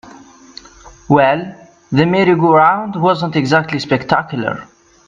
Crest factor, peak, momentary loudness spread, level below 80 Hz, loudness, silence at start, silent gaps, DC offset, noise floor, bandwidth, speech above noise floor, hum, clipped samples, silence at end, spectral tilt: 16 dB; 0 dBFS; 11 LU; -50 dBFS; -14 LUFS; 0.05 s; none; under 0.1%; -41 dBFS; 8.8 kHz; 27 dB; none; under 0.1%; 0.45 s; -7 dB/octave